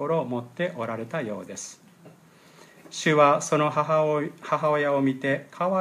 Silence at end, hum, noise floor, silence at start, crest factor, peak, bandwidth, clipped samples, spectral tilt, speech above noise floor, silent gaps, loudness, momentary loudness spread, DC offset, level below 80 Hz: 0 s; none; -53 dBFS; 0 s; 20 dB; -6 dBFS; 14.5 kHz; under 0.1%; -5 dB/octave; 29 dB; none; -25 LUFS; 15 LU; under 0.1%; -78 dBFS